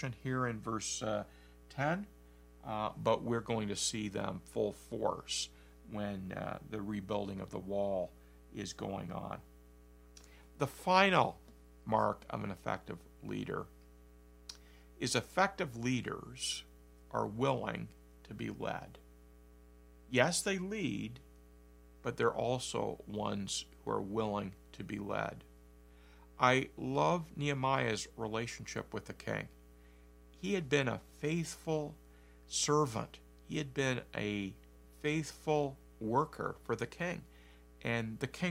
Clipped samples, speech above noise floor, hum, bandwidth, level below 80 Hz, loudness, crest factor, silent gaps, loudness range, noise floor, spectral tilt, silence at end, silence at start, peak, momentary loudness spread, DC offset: under 0.1%; 23 dB; 60 Hz at -60 dBFS; 16 kHz; -60 dBFS; -37 LUFS; 28 dB; none; 6 LU; -59 dBFS; -4.5 dB/octave; 0 s; 0 s; -10 dBFS; 13 LU; under 0.1%